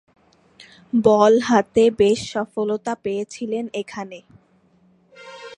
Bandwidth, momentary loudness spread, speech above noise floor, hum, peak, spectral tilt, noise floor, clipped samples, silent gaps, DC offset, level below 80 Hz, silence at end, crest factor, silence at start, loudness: 10.5 kHz; 18 LU; 39 dB; none; -2 dBFS; -5 dB/octave; -58 dBFS; under 0.1%; none; under 0.1%; -58 dBFS; 0.05 s; 20 dB; 0.95 s; -19 LUFS